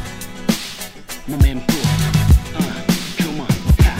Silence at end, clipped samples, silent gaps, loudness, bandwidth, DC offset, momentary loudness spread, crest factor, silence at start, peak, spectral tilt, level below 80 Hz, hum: 0 s; under 0.1%; none; -18 LUFS; 16.5 kHz; 1%; 14 LU; 16 dB; 0 s; 0 dBFS; -5.5 dB/octave; -20 dBFS; none